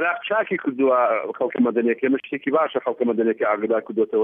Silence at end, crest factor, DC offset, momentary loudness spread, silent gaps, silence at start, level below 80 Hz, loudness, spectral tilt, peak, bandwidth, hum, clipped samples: 0 s; 14 dB; under 0.1%; 4 LU; none; 0 s; -82 dBFS; -22 LUFS; -9 dB/octave; -8 dBFS; 3.7 kHz; none; under 0.1%